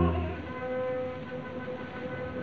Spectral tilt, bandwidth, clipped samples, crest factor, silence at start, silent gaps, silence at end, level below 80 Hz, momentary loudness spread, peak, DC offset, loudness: -9 dB/octave; 6.6 kHz; under 0.1%; 18 dB; 0 s; none; 0 s; -42 dBFS; 6 LU; -14 dBFS; 0.2%; -35 LUFS